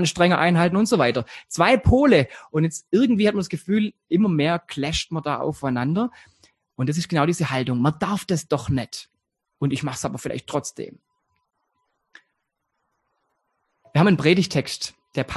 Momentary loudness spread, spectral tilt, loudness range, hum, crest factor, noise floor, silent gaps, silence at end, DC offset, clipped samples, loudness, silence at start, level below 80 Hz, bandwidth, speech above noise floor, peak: 11 LU; -5.5 dB/octave; 11 LU; none; 20 dB; -77 dBFS; none; 0 s; under 0.1%; under 0.1%; -22 LUFS; 0 s; -42 dBFS; 12.5 kHz; 56 dB; -2 dBFS